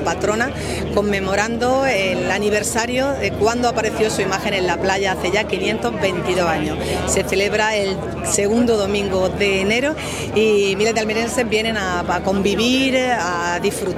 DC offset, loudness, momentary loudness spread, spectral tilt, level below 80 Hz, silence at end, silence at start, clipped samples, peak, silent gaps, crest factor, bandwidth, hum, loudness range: under 0.1%; -18 LUFS; 4 LU; -4 dB/octave; -40 dBFS; 0 s; 0 s; under 0.1%; -2 dBFS; none; 18 dB; 16 kHz; none; 1 LU